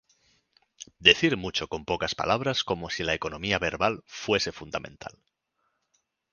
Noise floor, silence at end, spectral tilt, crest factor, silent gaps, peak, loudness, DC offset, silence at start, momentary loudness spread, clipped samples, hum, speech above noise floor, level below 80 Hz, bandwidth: -77 dBFS; 1.25 s; -3.5 dB/octave; 28 dB; none; 0 dBFS; -26 LUFS; under 0.1%; 0.8 s; 19 LU; under 0.1%; none; 49 dB; -52 dBFS; 10 kHz